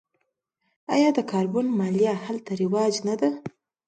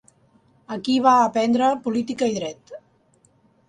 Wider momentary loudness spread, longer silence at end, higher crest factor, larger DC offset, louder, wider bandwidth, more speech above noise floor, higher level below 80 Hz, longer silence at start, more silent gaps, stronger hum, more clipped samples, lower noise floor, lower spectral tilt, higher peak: second, 10 LU vs 16 LU; second, 0.4 s vs 0.9 s; about the same, 16 dB vs 18 dB; neither; second, -24 LUFS vs -20 LUFS; about the same, 9.2 kHz vs 10 kHz; first, 53 dB vs 40 dB; second, -72 dBFS vs -66 dBFS; first, 0.9 s vs 0.7 s; neither; neither; neither; first, -76 dBFS vs -60 dBFS; first, -6 dB/octave vs -4.5 dB/octave; about the same, -8 dBFS vs -6 dBFS